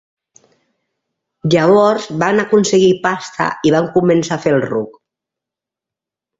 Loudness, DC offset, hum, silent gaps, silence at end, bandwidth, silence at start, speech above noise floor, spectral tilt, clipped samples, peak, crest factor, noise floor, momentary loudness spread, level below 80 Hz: -14 LUFS; under 0.1%; none; none; 1.5 s; 8 kHz; 1.45 s; 72 dB; -5.5 dB/octave; under 0.1%; -2 dBFS; 14 dB; -86 dBFS; 9 LU; -54 dBFS